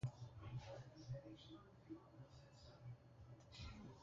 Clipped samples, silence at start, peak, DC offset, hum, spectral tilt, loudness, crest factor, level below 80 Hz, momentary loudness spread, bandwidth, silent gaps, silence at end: under 0.1%; 0 s; -36 dBFS; under 0.1%; none; -6.5 dB/octave; -58 LUFS; 20 dB; -68 dBFS; 9 LU; 7.4 kHz; none; 0 s